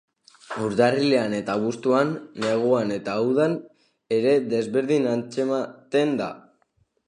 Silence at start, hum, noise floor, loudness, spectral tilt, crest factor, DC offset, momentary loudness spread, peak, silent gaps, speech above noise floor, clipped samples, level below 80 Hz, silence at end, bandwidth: 0.5 s; none; -68 dBFS; -23 LUFS; -6 dB/octave; 18 dB; under 0.1%; 8 LU; -6 dBFS; none; 45 dB; under 0.1%; -68 dBFS; 0.65 s; 10.5 kHz